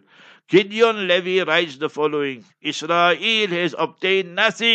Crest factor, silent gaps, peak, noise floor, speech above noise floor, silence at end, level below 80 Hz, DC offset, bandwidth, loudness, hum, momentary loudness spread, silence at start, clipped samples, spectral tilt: 18 dB; none; -2 dBFS; -50 dBFS; 30 dB; 0 s; -76 dBFS; under 0.1%; 8.6 kHz; -19 LUFS; none; 9 LU; 0.5 s; under 0.1%; -4 dB/octave